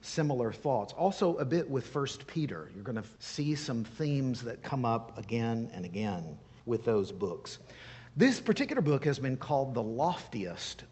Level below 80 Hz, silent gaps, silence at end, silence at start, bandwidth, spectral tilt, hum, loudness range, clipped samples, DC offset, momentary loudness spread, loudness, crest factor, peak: -64 dBFS; none; 0.05 s; 0.05 s; 8.4 kHz; -6 dB/octave; none; 4 LU; under 0.1%; under 0.1%; 11 LU; -33 LUFS; 20 dB; -12 dBFS